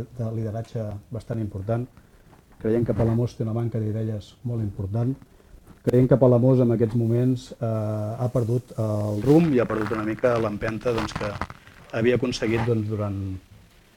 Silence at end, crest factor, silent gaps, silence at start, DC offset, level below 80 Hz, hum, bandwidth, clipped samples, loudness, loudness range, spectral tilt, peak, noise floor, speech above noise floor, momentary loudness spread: 0.6 s; 20 dB; none; 0 s; under 0.1%; -48 dBFS; none; 12.5 kHz; under 0.1%; -24 LUFS; 5 LU; -8 dB/octave; -4 dBFS; -52 dBFS; 29 dB; 14 LU